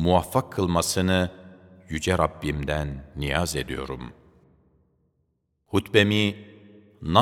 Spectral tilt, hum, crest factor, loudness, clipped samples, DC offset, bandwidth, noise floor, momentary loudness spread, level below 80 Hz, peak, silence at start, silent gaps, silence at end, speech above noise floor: -5 dB/octave; none; 26 dB; -25 LUFS; under 0.1%; under 0.1%; 17.5 kHz; -73 dBFS; 14 LU; -42 dBFS; 0 dBFS; 0 s; none; 0 s; 48 dB